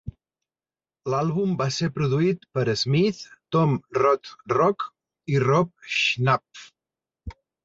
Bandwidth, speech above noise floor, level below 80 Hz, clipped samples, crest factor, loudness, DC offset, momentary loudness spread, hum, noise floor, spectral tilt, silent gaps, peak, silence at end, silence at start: 7.8 kHz; over 67 dB; -54 dBFS; under 0.1%; 18 dB; -23 LUFS; under 0.1%; 17 LU; none; under -90 dBFS; -6 dB/octave; none; -6 dBFS; 0.35 s; 0.05 s